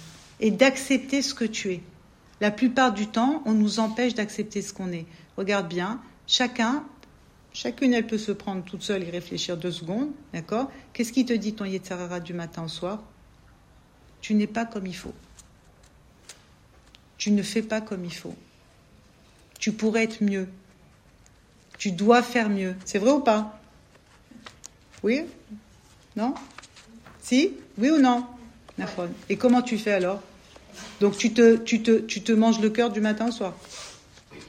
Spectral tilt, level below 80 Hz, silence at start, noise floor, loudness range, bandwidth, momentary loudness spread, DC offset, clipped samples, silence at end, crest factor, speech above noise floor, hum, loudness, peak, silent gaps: -4.5 dB/octave; -60 dBFS; 0 s; -56 dBFS; 10 LU; 14.5 kHz; 19 LU; under 0.1%; under 0.1%; 0.05 s; 22 dB; 31 dB; none; -25 LUFS; -4 dBFS; none